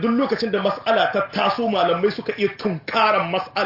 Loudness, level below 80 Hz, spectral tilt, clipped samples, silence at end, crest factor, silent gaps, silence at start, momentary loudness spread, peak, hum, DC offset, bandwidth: -21 LUFS; -62 dBFS; -6.5 dB/octave; under 0.1%; 0 s; 14 dB; none; 0 s; 5 LU; -6 dBFS; none; under 0.1%; 5.8 kHz